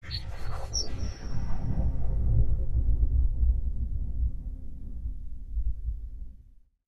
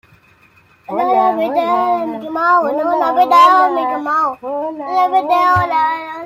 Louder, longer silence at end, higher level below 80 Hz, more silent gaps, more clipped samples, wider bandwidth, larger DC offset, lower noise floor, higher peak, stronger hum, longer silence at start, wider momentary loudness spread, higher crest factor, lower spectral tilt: second, -32 LUFS vs -14 LUFS; first, 0.55 s vs 0 s; first, -30 dBFS vs -54 dBFS; neither; neither; second, 6.4 kHz vs 15.5 kHz; neither; first, -54 dBFS vs -50 dBFS; second, -12 dBFS vs 0 dBFS; neither; second, 0.05 s vs 0.9 s; first, 14 LU vs 10 LU; about the same, 14 dB vs 14 dB; about the same, -5 dB/octave vs -5.5 dB/octave